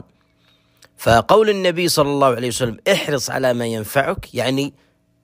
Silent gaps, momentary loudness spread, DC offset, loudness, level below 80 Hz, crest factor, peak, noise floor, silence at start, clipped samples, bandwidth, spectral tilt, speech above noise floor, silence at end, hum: none; 9 LU; under 0.1%; -18 LUFS; -44 dBFS; 18 dB; 0 dBFS; -58 dBFS; 1 s; under 0.1%; 16 kHz; -4.5 dB/octave; 41 dB; 0.55 s; none